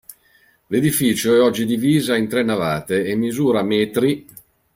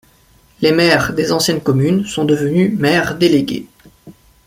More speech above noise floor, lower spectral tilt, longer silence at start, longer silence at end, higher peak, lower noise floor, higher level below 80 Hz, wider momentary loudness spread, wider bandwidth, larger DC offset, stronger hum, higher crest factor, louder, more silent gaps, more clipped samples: about the same, 39 dB vs 37 dB; about the same, -5 dB/octave vs -5 dB/octave; second, 0.1 s vs 0.6 s; first, 0.55 s vs 0.35 s; second, -4 dBFS vs 0 dBFS; first, -57 dBFS vs -50 dBFS; second, -56 dBFS vs -46 dBFS; about the same, 6 LU vs 4 LU; about the same, 16.5 kHz vs 16.5 kHz; neither; neither; about the same, 16 dB vs 16 dB; second, -18 LUFS vs -14 LUFS; neither; neither